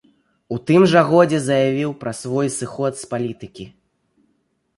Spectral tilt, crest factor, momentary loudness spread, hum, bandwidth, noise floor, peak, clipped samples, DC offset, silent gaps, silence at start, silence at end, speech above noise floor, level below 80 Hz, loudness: -6 dB/octave; 18 dB; 20 LU; none; 11.5 kHz; -67 dBFS; 0 dBFS; under 0.1%; under 0.1%; none; 0.5 s; 1.1 s; 49 dB; -60 dBFS; -18 LUFS